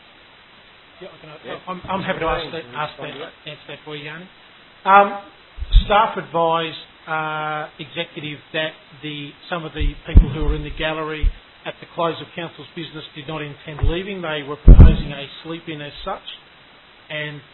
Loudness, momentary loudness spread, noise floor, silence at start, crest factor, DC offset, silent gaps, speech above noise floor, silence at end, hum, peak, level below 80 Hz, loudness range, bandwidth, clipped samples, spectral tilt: -21 LUFS; 20 LU; -48 dBFS; 1 s; 20 dB; under 0.1%; none; 29 dB; 0.15 s; none; 0 dBFS; -22 dBFS; 9 LU; 4.2 kHz; 0.1%; -10 dB/octave